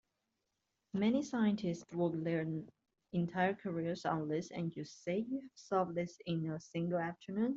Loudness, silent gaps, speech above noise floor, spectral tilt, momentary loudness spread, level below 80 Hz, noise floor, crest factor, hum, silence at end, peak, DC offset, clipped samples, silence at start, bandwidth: -38 LUFS; none; 49 dB; -7 dB/octave; 8 LU; -76 dBFS; -86 dBFS; 18 dB; none; 0 s; -20 dBFS; under 0.1%; under 0.1%; 0.95 s; 7.8 kHz